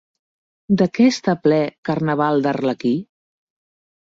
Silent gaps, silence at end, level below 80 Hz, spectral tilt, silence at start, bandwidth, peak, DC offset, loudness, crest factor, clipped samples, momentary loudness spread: 1.78-1.83 s; 1.1 s; -60 dBFS; -6.5 dB/octave; 0.7 s; 7.8 kHz; -4 dBFS; under 0.1%; -19 LUFS; 16 dB; under 0.1%; 7 LU